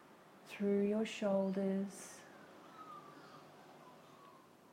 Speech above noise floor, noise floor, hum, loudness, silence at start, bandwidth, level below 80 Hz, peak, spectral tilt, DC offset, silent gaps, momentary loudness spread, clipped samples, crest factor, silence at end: 25 dB; -62 dBFS; none; -37 LUFS; 0.1 s; 15.5 kHz; -84 dBFS; -24 dBFS; -6.5 dB/octave; under 0.1%; none; 24 LU; under 0.1%; 18 dB; 0.35 s